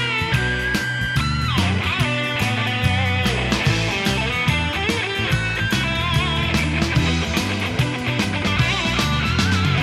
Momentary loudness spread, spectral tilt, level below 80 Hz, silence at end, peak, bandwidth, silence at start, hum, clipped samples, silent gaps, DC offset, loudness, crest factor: 3 LU; -4.5 dB/octave; -34 dBFS; 0 s; -6 dBFS; 16 kHz; 0 s; none; under 0.1%; none; under 0.1%; -20 LUFS; 14 dB